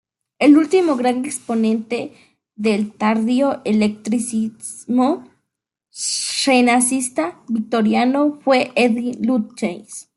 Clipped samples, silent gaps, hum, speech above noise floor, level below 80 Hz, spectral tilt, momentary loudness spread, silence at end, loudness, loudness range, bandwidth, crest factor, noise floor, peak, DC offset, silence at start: under 0.1%; none; none; 62 dB; -66 dBFS; -4 dB/octave; 12 LU; 0.15 s; -18 LUFS; 3 LU; 12 kHz; 16 dB; -80 dBFS; -2 dBFS; under 0.1%; 0.4 s